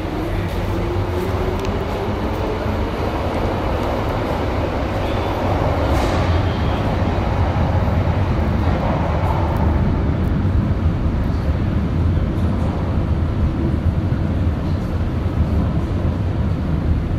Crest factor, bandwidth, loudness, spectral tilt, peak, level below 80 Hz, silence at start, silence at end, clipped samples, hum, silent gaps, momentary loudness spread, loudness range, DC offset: 14 dB; 13.5 kHz; -20 LUFS; -8 dB/octave; -6 dBFS; -24 dBFS; 0 s; 0 s; under 0.1%; none; none; 4 LU; 3 LU; under 0.1%